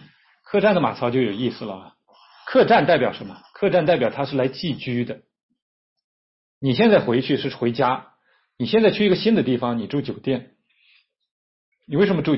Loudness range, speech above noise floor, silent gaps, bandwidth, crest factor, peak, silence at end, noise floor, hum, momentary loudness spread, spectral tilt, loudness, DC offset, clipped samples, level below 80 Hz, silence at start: 4 LU; 41 dB; 5.43-5.49 s, 5.62-5.96 s, 6.04-6.61 s, 11.31-11.72 s; 5.8 kHz; 16 dB; -6 dBFS; 0 s; -61 dBFS; none; 13 LU; -10.5 dB/octave; -21 LUFS; under 0.1%; under 0.1%; -60 dBFS; 0.5 s